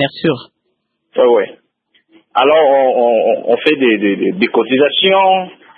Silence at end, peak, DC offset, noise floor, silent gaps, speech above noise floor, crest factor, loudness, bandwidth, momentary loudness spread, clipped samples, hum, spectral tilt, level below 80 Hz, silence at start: 0.3 s; 0 dBFS; under 0.1%; -68 dBFS; none; 56 dB; 14 dB; -12 LUFS; 4.8 kHz; 8 LU; under 0.1%; none; -7.5 dB/octave; -62 dBFS; 0 s